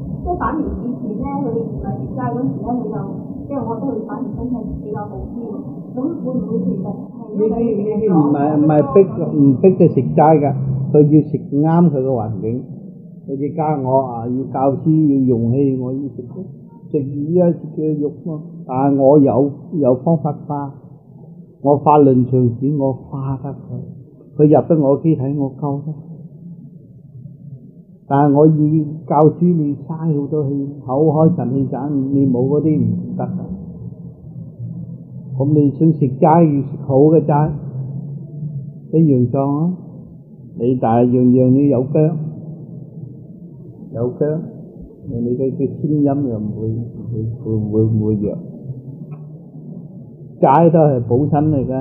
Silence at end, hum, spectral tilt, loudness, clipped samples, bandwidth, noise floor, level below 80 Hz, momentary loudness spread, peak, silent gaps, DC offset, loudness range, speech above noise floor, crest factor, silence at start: 0 s; none; -14 dB/octave; -16 LUFS; under 0.1%; 3.2 kHz; -41 dBFS; -44 dBFS; 21 LU; 0 dBFS; none; under 0.1%; 8 LU; 26 dB; 16 dB; 0 s